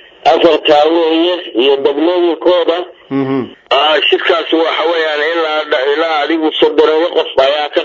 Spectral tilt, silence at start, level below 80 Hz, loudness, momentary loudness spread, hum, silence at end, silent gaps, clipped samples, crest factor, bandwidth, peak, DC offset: -5 dB/octave; 0.25 s; -56 dBFS; -12 LUFS; 6 LU; none; 0 s; none; under 0.1%; 12 dB; 7.6 kHz; 0 dBFS; under 0.1%